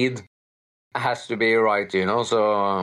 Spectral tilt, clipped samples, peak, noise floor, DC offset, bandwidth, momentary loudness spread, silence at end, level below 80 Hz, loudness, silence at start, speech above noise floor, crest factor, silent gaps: -5 dB/octave; under 0.1%; -10 dBFS; under -90 dBFS; under 0.1%; 11.5 kHz; 8 LU; 0 s; -72 dBFS; -22 LUFS; 0 s; over 68 dB; 14 dB; 0.27-0.91 s